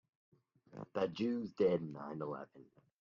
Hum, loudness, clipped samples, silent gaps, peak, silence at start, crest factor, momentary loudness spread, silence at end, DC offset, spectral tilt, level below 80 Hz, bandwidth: none; -39 LUFS; under 0.1%; none; -22 dBFS; 0.7 s; 18 dB; 19 LU; 0.4 s; under 0.1%; -6.5 dB/octave; -78 dBFS; 7.2 kHz